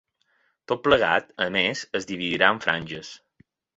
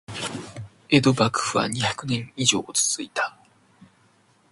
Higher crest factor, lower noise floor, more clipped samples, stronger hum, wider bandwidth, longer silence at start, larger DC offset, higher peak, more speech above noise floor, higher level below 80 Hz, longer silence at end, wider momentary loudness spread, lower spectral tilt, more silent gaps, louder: about the same, 24 dB vs 22 dB; first, -69 dBFS vs -60 dBFS; neither; neither; second, 8 kHz vs 11.5 kHz; first, 0.7 s vs 0.1 s; neither; about the same, -2 dBFS vs -4 dBFS; first, 45 dB vs 38 dB; about the same, -58 dBFS vs -58 dBFS; second, 0.6 s vs 1.2 s; about the same, 13 LU vs 13 LU; about the same, -4 dB/octave vs -3.5 dB/octave; neither; about the same, -23 LUFS vs -23 LUFS